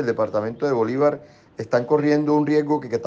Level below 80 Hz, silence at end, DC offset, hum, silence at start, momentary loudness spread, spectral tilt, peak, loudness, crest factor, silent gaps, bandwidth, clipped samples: -64 dBFS; 0 s; under 0.1%; none; 0 s; 5 LU; -7.5 dB/octave; -6 dBFS; -21 LUFS; 14 dB; none; 7.4 kHz; under 0.1%